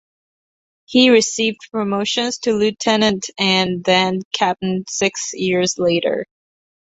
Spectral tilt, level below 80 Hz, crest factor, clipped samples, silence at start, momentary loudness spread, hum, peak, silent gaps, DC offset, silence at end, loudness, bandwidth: -3.5 dB/octave; -58 dBFS; 18 dB; under 0.1%; 0.9 s; 8 LU; none; 0 dBFS; 4.25-4.31 s; under 0.1%; 0.6 s; -17 LUFS; 8.2 kHz